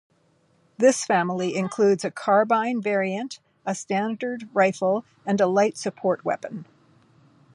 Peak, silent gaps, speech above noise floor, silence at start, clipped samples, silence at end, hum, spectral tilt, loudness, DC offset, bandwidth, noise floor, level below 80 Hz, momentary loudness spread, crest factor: -6 dBFS; none; 41 dB; 0.8 s; under 0.1%; 0.9 s; none; -5 dB/octave; -23 LUFS; under 0.1%; 11.5 kHz; -63 dBFS; -76 dBFS; 11 LU; 18 dB